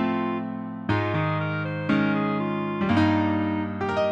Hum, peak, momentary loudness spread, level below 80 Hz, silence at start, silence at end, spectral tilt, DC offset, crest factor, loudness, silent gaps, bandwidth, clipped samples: none; -10 dBFS; 6 LU; -56 dBFS; 0 s; 0 s; -8 dB/octave; under 0.1%; 14 dB; -25 LUFS; none; 7.8 kHz; under 0.1%